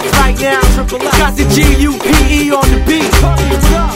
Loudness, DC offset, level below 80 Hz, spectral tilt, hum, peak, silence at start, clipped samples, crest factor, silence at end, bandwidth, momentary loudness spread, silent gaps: -10 LUFS; 0.3%; -12 dBFS; -4.5 dB/octave; none; 0 dBFS; 0 s; 0.5%; 10 dB; 0 s; 16.5 kHz; 2 LU; none